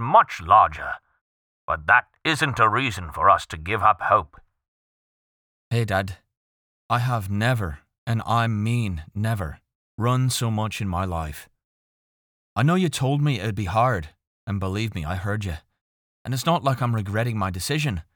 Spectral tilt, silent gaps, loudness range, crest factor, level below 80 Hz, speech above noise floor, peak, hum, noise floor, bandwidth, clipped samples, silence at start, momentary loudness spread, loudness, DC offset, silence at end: -5.5 dB/octave; 1.21-1.68 s, 4.68-5.71 s, 6.37-6.89 s, 7.98-8.07 s, 9.75-9.98 s, 11.64-12.56 s, 14.27-14.47 s, 15.81-16.25 s; 6 LU; 20 dB; -46 dBFS; over 68 dB; -4 dBFS; none; under -90 dBFS; 20 kHz; under 0.1%; 0 s; 14 LU; -23 LUFS; under 0.1%; 0.15 s